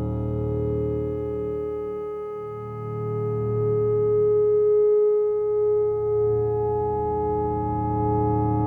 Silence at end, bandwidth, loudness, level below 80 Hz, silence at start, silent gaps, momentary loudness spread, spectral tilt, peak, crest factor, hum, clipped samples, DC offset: 0 s; 2.6 kHz; -24 LUFS; -44 dBFS; 0 s; none; 11 LU; -12 dB/octave; -14 dBFS; 10 dB; none; under 0.1%; under 0.1%